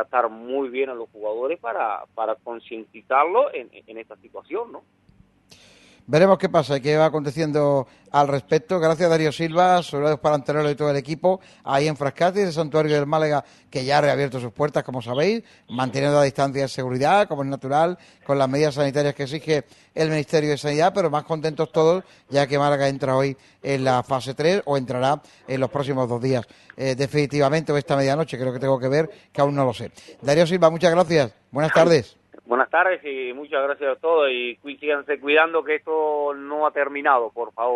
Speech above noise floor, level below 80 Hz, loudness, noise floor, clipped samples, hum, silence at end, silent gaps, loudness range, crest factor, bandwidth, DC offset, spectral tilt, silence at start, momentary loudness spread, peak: 33 dB; -60 dBFS; -22 LUFS; -54 dBFS; under 0.1%; none; 0 s; none; 5 LU; 20 dB; 12 kHz; under 0.1%; -6 dB/octave; 0 s; 11 LU; -2 dBFS